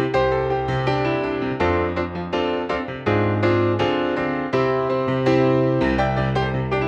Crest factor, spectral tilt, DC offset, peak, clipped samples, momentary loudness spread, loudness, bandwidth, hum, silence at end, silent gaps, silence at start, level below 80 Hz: 14 dB; -7.5 dB/octave; under 0.1%; -6 dBFS; under 0.1%; 6 LU; -21 LUFS; 8 kHz; none; 0 s; none; 0 s; -40 dBFS